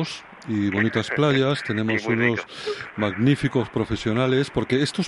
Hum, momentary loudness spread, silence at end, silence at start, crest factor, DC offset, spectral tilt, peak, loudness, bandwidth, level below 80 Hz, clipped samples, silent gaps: none; 9 LU; 0 s; 0 s; 16 dB; under 0.1%; -6 dB/octave; -6 dBFS; -23 LUFS; 11.5 kHz; -50 dBFS; under 0.1%; none